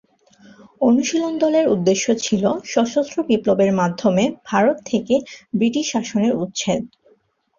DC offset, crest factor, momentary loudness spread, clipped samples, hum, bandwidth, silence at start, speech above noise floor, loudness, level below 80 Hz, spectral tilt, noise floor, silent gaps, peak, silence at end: under 0.1%; 16 dB; 5 LU; under 0.1%; none; 7.4 kHz; 0.8 s; 41 dB; -19 LUFS; -58 dBFS; -5 dB/octave; -59 dBFS; none; -2 dBFS; 0.7 s